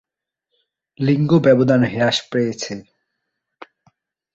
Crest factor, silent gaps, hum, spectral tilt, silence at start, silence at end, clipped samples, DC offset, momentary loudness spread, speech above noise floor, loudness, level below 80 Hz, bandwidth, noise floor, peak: 18 dB; none; none; -6 dB/octave; 1 s; 1.55 s; under 0.1%; under 0.1%; 14 LU; 63 dB; -17 LUFS; -58 dBFS; 8 kHz; -79 dBFS; -2 dBFS